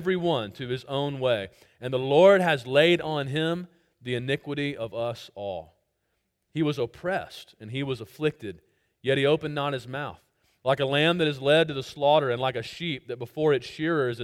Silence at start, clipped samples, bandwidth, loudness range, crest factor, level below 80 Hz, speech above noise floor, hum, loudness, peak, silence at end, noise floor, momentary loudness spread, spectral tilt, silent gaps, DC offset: 0 s; under 0.1%; 15.5 kHz; 9 LU; 20 dB; -64 dBFS; 51 dB; none; -26 LUFS; -6 dBFS; 0 s; -76 dBFS; 15 LU; -6 dB/octave; none; under 0.1%